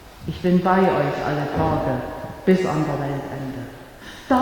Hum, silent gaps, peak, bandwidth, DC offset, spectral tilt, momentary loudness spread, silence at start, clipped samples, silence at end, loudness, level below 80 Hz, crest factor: none; none; -4 dBFS; 18.5 kHz; under 0.1%; -7.5 dB/octave; 17 LU; 0 s; under 0.1%; 0 s; -22 LUFS; -44 dBFS; 16 dB